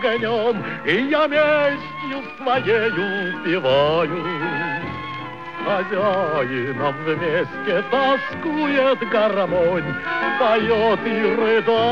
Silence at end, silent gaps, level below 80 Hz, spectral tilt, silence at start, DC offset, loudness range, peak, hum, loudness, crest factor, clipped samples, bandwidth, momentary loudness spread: 0 s; none; -54 dBFS; -7 dB/octave; 0 s; 0.4%; 3 LU; -6 dBFS; none; -20 LUFS; 14 dB; under 0.1%; 7.2 kHz; 8 LU